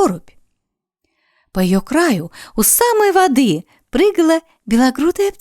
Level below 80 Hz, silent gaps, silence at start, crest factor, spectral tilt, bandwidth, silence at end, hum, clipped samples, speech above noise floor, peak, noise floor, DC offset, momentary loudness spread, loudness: -42 dBFS; none; 0 s; 16 dB; -4 dB/octave; 19.5 kHz; 0.1 s; none; under 0.1%; 63 dB; 0 dBFS; -77 dBFS; under 0.1%; 11 LU; -15 LUFS